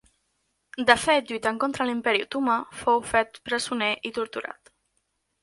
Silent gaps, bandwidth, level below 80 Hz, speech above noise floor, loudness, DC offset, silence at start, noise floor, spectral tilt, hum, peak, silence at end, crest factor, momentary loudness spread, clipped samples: none; 11.5 kHz; -60 dBFS; 50 dB; -25 LUFS; under 0.1%; 0.75 s; -75 dBFS; -2.5 dB/octave; none; -2 dBFS; 0.9 s; 26 dB; 11 LU; under 0.1%